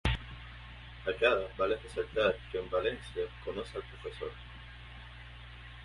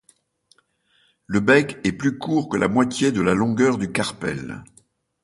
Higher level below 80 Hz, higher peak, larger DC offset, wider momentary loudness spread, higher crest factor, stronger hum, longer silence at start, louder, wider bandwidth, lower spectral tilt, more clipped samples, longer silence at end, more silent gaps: first, -46 dBFS vs -52 dBFS; second, -12 dBFS vs -4 dBFS; neither; first, 19 LU vs 11 LU; about the same, 24 dB vs 20 dB; first, 60 Hz at -50 dBFS vs none; second, 0.05 s vs 1.3 s; second, -34 LUFS vs -21 LUFS; about the same, 11.5 kHz vs 11.5 kHz; about the same, -5.5 dB/octave vs -5.5 dB/octave; neither; second, 0 s vs 0.6 s; neither